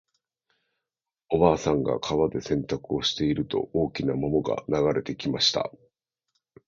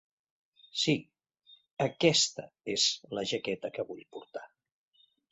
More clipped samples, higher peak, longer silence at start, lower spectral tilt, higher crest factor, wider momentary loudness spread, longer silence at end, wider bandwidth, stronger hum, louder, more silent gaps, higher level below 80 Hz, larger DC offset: neither; first, -6 dBFS vs -10 dBFS; first, 1.3 s vs 0.75 s; first, -5.5 dB/octave vs -3 dB/octave; about the same, 22 dB vs 24 dB; second, 7 LU vs 20 LU; first, 1 s vs 0.85 s; about the same, 7.6 kHz vs 8.2 kHz; neither; first, -26 LUFS vs -30 LUFS; second, none vs 1.71-1.77 s; first, -50 dBFS vs -74 dBFS; neither